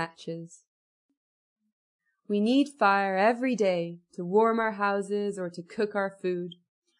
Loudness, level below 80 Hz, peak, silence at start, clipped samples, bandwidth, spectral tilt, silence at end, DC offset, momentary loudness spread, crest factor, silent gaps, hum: -27 LUFS; -80 dBFS; -10 dBFS; 0 s; under 0.1%; 11 kHz; -6 dB/octave; 0.45 s; under 0.1%; 14 LU; 18 dB; 0.68-1.09 s, 1.17-1.56 s, 1.72-1.99 s; none